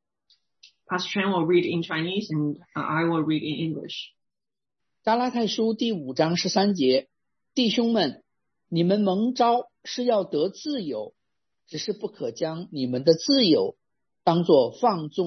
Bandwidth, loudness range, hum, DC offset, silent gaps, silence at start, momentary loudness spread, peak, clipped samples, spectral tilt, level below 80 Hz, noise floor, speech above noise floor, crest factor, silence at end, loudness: 6.4 kHz; 4 LU; none; under 0.1%; none; 0.9 s; 11 LU; -4 dBFS; under 0.1%; -5.5 dB/octave; -72 dBFS; under -90 dBFS; over 66 dB; 20 dB; 0 s; -24 LUFS